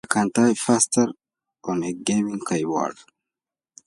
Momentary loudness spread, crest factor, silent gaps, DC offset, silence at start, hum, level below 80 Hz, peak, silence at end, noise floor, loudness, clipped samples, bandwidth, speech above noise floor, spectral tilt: 9 LU; 22 dB; none; under 0.1%; 0.1 s; none; -66 dBFS; -2 dBFS; 0.95 s; -90 dBFS; -22 LUFS; under 0.1%; 11.5 kHz; 68 dB; -4 dB/octave